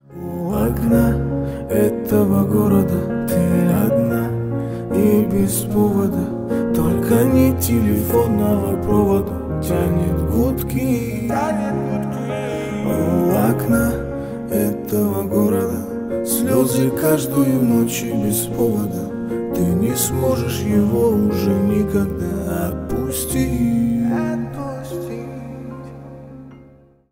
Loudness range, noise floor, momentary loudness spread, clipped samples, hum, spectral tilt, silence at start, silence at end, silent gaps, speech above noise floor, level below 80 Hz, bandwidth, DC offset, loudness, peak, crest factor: 4 LU; -48 dBFS; 9 LU; under 0.1%; none; -6.5 dB/octave; 0.1 s; 0.5 s; none; 31 dB; -36 dBFS; 16.5 kHz; under 0.1%; -19 LUFS; -2 dBFS; 16 dB